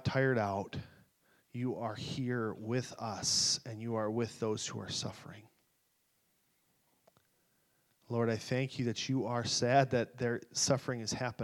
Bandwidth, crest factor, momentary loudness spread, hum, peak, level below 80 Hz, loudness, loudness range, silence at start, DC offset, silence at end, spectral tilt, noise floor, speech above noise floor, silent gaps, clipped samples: 14 kHz; 24 dB; 11 LU; none; -12 dBFS; -68 dBFS; -34 LUFS; 10 LU; 0 s; under 0.1%; 0 s; -4 dB/octave; -76 dBFS; 42 dB; none; under 0.1%